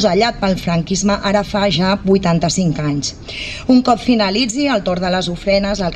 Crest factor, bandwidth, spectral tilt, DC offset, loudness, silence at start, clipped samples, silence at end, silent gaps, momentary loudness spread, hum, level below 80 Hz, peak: 14 dB; 12 kHz; -5 dB/octave; under 0.1%; -16 LUFS; 0 s; under 0.1%; 0 s; none; 5 LU; none; -36 dBFS; -2 dBFS